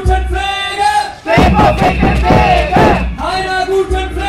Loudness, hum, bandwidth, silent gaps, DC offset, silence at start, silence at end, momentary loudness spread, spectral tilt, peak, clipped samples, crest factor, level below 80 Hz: -12 LUFS; none; 14 kHz; none; under 0.1%; 0 s; 0 s; 7 LU; -6 dB/octave; 0 dBFS; under 0.1%; 10 dB; -18 dBFS